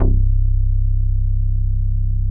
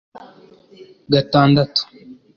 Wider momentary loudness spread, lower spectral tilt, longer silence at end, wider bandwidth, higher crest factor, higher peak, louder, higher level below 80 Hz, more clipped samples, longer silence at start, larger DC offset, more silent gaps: second, 3 LU vs 8 LU; first, -15.5 dB/octave vs -7.5 dB/octave; second, 0 s vs 0.25 s; second, 1.1 kHz vs 7 kHz; second, 10 dB vs 18 dB; about the same, -4 dBFS vs -2 dBFS; second, -21 LUFS vs -16 LUFS; first, -16 dBFS vs -52 dBFS; neither; second, 0 s vs 0.15 s; neither; neither